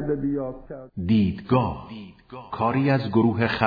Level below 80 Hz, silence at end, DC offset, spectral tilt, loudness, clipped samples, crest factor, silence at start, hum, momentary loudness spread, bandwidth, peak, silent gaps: -48 dBFS; 0 s; under 0.1%; -9.5 dB/octave; -23 LUFS; under 0.1%; 20 dB; 0 s; none; 19 LU; 5 kHz; -4 dBFS; none